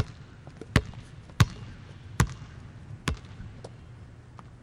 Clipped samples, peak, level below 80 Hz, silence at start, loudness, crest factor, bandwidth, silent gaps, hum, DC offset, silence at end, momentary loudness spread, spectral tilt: under 0.1%; -6 dBFS; -42 dBFS; 0 s; -30 LUFS; 26 dB; 16.5 kHz; none; none; under 0.1%; 0 s; 21 LU; -5 dB/octave